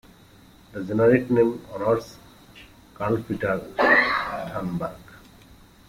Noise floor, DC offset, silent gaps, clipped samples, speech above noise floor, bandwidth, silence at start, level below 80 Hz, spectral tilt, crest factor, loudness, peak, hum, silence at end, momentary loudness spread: -51 dBFS; under 0.1%; none; under 0.1%; 29 dB; 16 kHz; 0.75 s; -52 dBFS; -7 dB/octave; 18 dB; -23 LUFS; -6 dBFS; none; 0.7 s; 14 LU